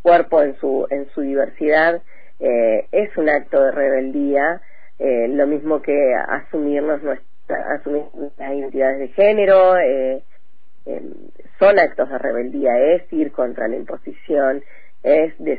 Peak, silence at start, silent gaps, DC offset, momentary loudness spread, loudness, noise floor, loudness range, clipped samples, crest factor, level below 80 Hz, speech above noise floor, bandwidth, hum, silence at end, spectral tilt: -2 dBFS; 0.05 s; none; 4%; 14 LU; -18 LUFS; -61 dBFS; 3 LU; under 0.1%; 16 dB; -56 dBFS; 44 dB; 5 kHz; none; 0 s; -8.5 dB/octave